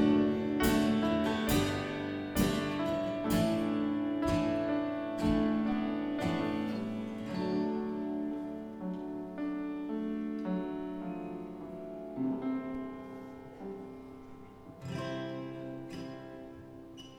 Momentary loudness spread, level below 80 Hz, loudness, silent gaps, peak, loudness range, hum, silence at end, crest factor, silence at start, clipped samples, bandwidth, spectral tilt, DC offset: 16 LU; -52 dBFS; -34 LUFS; none; -14 dBFS; 11 LU; none; 0 s; 18 dB; 0 s; under 0.1%; over 20 kHz; -6 dB/octave; under 0.1%